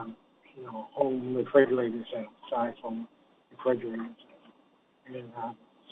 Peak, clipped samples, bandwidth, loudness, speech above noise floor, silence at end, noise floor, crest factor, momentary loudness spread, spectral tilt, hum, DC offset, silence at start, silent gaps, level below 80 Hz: -8 dBFS; under 0.1%; 4 kHz; -31 LUFS; 35 dB; 0.35 s; -65 dBFS; 24 dB; 20 LU; -8.5 dB/octave; none; under 0.1%; 0 s; none; -80 dBFS